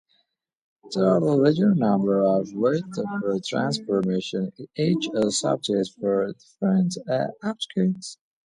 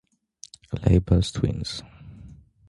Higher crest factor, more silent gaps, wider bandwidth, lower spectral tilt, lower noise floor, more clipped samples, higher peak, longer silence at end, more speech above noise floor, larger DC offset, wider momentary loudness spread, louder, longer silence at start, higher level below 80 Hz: about the same, 16 dB vs 20 dB; neither; about the same, 11 kHz vs 11.5 kHz; about the same, -6 dB/octave vs -7 dB/octave; first, -72 dBFS vs -51 dBFS; neither; about the same, -6 dBFS vs -6 dBFS; about the same, 0.3 s vs 0.35 s; first, 49 dB vs 29 dB; neither; second, 10 LU vs 25 LU; about the same, -24 LUFS vs -24 LUFS; first, 0.85 s vs 0.7 s; second, -66 dBFS vs -34 dBFS